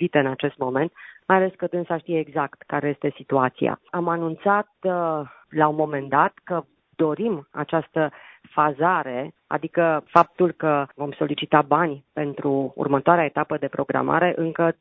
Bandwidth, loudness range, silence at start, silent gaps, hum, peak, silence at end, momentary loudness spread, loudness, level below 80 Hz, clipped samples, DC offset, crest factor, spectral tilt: 6.6 kHz; 3 LU; 0 s; none; none; 0 dBFS; 0.1 s; 10 LU; -23 LUFS; -64 dBFS; under 0.1%; under 0.1%; 22 dB; -9 dB/octave